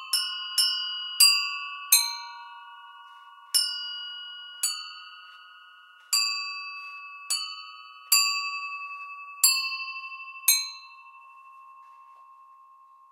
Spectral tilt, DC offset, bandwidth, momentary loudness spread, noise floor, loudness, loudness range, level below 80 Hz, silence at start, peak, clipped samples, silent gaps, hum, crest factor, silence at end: 11 dB/octave; under 0.1%; 16 kHz; 22 LU; -54 dBFS; -24 LUFS; 7 LU; under -90 dBFS; 0 s; -4 dBFS; under 0.1%; none; none; 26 dB; 0.55 s